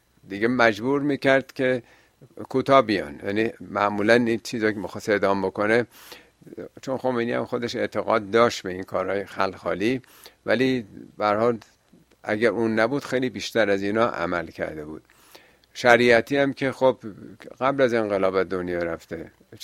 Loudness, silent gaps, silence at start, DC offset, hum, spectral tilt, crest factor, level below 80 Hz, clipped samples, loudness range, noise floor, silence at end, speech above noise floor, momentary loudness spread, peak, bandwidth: -23 LUFS; none; 0.3 s; under 0.1%; none; -5.5 dB/octave; 24 dB; -60 dBFS; under 0.1%; 4 LU; -56 dBFS; 0 s; 33 dB; 17 LU; 0 dBFS; 15.5 kHz